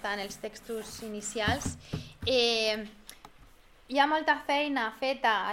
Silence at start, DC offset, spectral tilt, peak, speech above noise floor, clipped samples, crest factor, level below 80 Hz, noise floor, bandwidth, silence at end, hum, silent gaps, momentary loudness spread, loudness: 0 s; under 0.1%; -3 dB/octave; -10 dBFS; 26 dB; under 0.1%; 20 dB; -56 dBFS; -56 dBFS; 16.5 kHz; 0 s; none; none; 15 LU; -30 LUFS